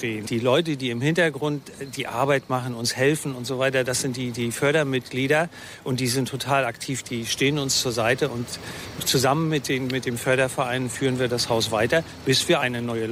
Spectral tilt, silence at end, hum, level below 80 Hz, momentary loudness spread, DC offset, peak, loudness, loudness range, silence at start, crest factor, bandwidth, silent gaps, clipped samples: -4 dB/octave; 0 s; none; -58 dBFS; 8 LU; under 0.1%; -6 dBFS; -23 LUFS; 1 LU; 0 s; 18 dB; 16 kHz; none; under 0.1%